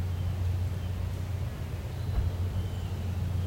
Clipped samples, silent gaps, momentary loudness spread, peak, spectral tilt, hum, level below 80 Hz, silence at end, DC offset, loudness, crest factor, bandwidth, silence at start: under 0.1%; none; 4 LU; -18 dBFS; -7 dB/octave; none; -40 dBFS; 0 s; under 0.1%; -33 LUFS; 12 dB; 16.5 kHz; 0 s